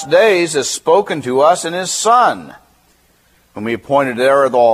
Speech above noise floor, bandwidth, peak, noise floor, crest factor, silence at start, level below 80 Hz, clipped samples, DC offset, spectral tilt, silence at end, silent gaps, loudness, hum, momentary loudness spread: 41 dB; 15.5 kHz; 0 dBFS; -54 dBFS; 14 dB; 0 s; -60 dBFS; under 0.1%; under 0.1%; -3 dB/octave; 0 s; none; -13 LUFS; none; 10 LU